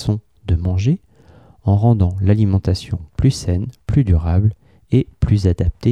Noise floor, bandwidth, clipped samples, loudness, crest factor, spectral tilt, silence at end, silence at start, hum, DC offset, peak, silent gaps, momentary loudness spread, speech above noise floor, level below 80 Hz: -47 dBFS; 10.5 kHz; under 0.1%; -18 LUFS; 14 dB; -8 dB/octave; 0 s; 0 s; none; 0.2%; -4 dBFS; none; 8 LU; 31 dB; -28 dBFS